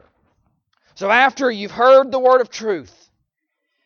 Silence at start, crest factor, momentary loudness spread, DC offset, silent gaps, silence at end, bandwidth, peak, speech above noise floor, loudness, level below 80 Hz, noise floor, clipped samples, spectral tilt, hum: 1 s; 18 dB; 13 LU; under 0.1%; none; 1 s; 6.8 kHz; 0 dBFS; 61 dB; -16 LUFS; -64 dBFS; -76 dBFS; under 0.1%; -3.5 dB/octave; none